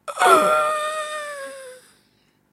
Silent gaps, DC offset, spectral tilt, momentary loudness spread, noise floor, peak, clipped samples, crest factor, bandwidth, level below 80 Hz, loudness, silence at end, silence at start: none; under 0.1%; -2 dB/octave; 20 LU; -62 dBFS; 0 dBFS; under 0.1%; 22 dB; 16 kHz; -76 dBFS; -19 LUFS; 0.75 s; 0.05 s